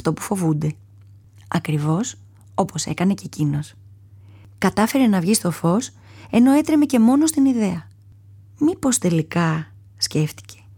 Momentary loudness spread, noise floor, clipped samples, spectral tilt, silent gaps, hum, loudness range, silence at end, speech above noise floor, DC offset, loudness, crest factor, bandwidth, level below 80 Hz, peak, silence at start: 12 LU; -47 dBFS; under 0.1%; -5.5 dB/octave; none; none; 7 LU; 0.25 s; 28 dB; under 0.1%; -20 LUFS; 16 dB; 20 kHz; -54 dBFS; -6 dBFS; 0.05 s